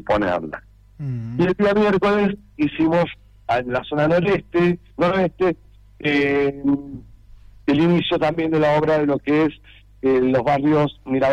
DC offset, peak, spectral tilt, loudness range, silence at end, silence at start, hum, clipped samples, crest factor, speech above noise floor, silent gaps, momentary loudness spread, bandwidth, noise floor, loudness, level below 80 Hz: under 0.1%; -8 dBFS; -8 dB/octave; 2 LU; 0 s; 0.05 s; none; under 0.1%; 12 dB; 26 dB; none; 10 LU; 8.6 kHz; -44 dBFS; -20 LUFS; -46 dBFS